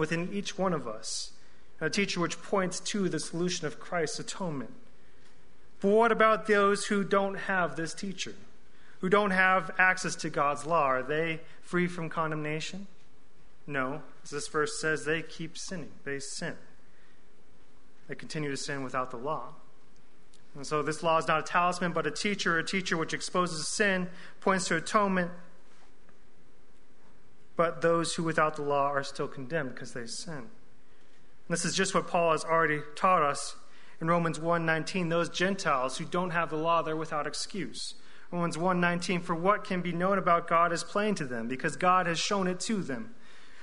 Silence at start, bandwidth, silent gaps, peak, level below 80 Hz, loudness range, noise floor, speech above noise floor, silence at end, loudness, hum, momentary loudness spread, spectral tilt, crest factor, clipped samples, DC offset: 0 s; 11 kHz; none; -10 dBFS; -64 dBFS; 7 LU; -62 dBFS; 32 dB; 0 s; -30 LUFS; none; 13 LU; -4 dB/octave; 22 dB; under 0.1%; 1%